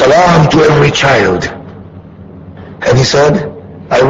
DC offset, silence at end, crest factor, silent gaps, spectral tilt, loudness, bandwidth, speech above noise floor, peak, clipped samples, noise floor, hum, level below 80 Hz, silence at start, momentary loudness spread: under 0.1%; 0 s; 10 dB; none; -5.5 dB/octave; -9 LUFS; 8 kHz; 24 dB; 0 dBFS; 0.2%; -31 dBFS; none; -34 dBFS; 0 s; 18 LU